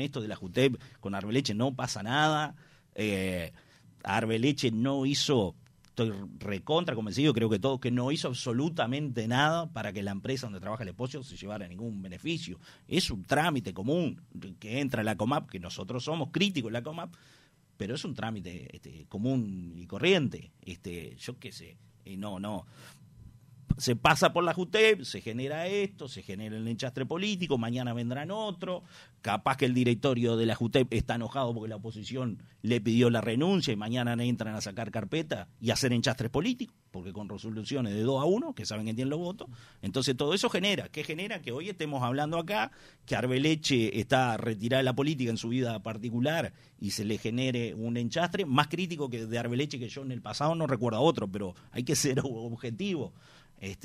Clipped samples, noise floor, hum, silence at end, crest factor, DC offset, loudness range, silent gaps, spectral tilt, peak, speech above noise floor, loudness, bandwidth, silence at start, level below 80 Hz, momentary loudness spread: under 0.1%; -53 dBFS; none; 0.1 s; 22 dB; under 0.1%; 5 LU; none; -5 dB/octave; -10 dBFS; 23 dB; -31 LUFS; 15.5 kHz; 0 s; -58 dBFS; 14 LU